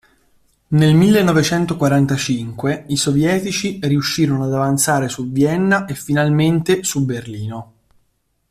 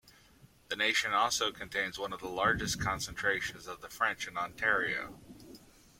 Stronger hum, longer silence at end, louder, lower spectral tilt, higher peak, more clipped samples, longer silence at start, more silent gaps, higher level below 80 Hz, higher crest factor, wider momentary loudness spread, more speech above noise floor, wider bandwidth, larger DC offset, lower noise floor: neither; first, 0.9 s vs 0.4 s; first, -16 LUFS vs -32 LUFS; first, -5.5 dB/octave vs -2 dB/octave; first, -2 dBFS vs -14 dBFS; neither; first, 0.7 s vs 0.05 s; neither; first, -48 dBFS vs -58 dBFS; second, 14 dB vs 20 dB; second, 9 LU vs 16 LU; first, 49 dB vs 28 dB; about the same, 15.5 kHz vs 16.5 kHz; neither; first, -65 dBFS vs -61 dBFS